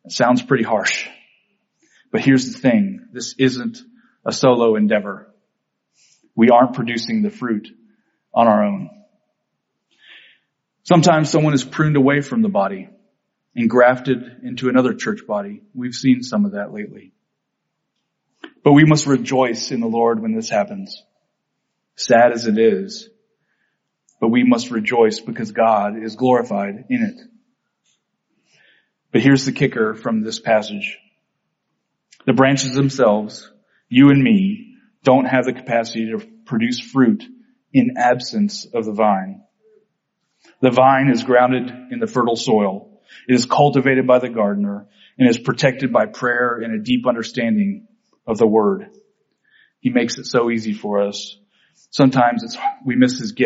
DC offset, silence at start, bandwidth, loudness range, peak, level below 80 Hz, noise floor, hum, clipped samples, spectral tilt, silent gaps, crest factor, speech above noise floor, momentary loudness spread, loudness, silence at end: under 0.1%; 0.05 s; 8 kHz; 4 LU; 0 dBFS; -62 dBFS; -75 dBFS; none; under 0.1%; -5 dB/octave; none; 18 dB; 59 dB; 14 LU; -17 LUFS; 0 s